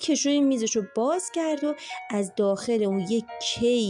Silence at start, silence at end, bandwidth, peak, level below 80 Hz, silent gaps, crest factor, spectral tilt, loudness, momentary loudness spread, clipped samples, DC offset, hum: 0 s; 0 s; 11 kHz; -14 dBFS; -64 dBFS; none; 12 dB; -4 dB/octave; -26 LUFS; 7 LU; under 0.1%; under 0.1%; none